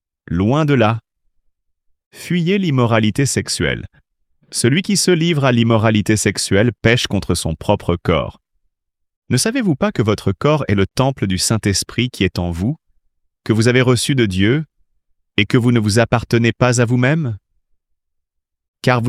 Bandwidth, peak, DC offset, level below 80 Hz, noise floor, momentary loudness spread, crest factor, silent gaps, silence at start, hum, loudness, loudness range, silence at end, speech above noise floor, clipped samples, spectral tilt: 15 kHz; 0 dBFS; under 0.1%; -44 dBFS; -75 dBFS; 7 LU; 16 dB; 2.06-2.11 s, 9.16-9.22 s, 18.68-18.74 s; 0.3 s; none; -16 LUFS; 3 LU; 0 s; 60 dB; under 0.1%; -5 dB/octave